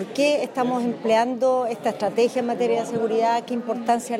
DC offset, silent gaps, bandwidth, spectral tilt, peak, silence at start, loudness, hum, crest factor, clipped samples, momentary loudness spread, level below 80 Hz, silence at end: under 0.1%; none; 15.5 kHz; -4.5 dB/octave; -8 dBFS; 0 s; -22 LUFS; none; 14 dB; under 0.1%; 4 LU; -76 dBFS; 0 s